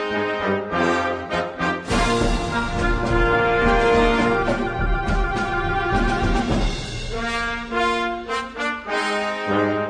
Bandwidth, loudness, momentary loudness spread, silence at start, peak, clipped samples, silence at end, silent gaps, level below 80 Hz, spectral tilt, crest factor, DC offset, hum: 10.5 kHz; -21 LUFS; 7 LU; 0 s; -6 dBFS; under 0.1%; 0 s; none; -28 dBFS; -5.5 dB/octave; 16 dB; under 0.1%; none